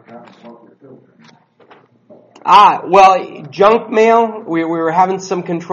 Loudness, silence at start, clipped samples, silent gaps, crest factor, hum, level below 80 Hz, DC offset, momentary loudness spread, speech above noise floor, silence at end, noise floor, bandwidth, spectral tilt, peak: -12 LUFS; 0.1 s; 0.3%; none; 14 dB; none; -56 dBFS; under 0.1%; 12 LU; 35 dB; 0 s; -47 dBFS; 9.4 kHz; -5 dB/octave; 0 dBFS